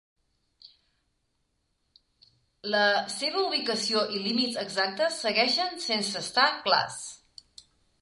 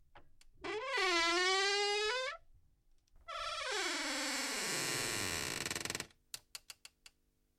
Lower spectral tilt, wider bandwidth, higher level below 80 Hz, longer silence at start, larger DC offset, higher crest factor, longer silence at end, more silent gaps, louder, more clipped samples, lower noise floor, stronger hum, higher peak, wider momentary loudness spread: about the same, -2 dB/octave vs -1 dB/octave; second, 11.5 kHz vs 16.5 kHz; second, -74 dBFS vs -66 dBFS; first, 0.65 s vs 0.15 s; neither; about the same, 22 dB vs 18 dB; second, 0.85 s vs 1 s; neither; first, -26 LUFS vs -35 LUFS; neither; about the same, -75 dBFS vs -76 dBFS; neither; first, -8 dBFS vs -22 dBFS; second, 6 LU vs 18 LU